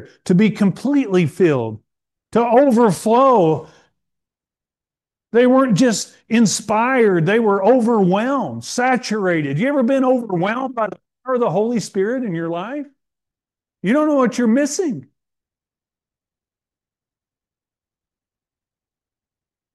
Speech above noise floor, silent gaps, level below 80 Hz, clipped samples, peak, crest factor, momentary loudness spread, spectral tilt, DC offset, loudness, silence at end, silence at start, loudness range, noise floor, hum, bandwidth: over 74 dB; none; -66 dBFS; under 0.1%; -4 dBFS; 14 dB; 10 LU; -6 dB/octave; under 0.1%; -17 LUFS; 4.75 s; 0 s; 6 LU; under -90 dBFS; none; 12.5 kHz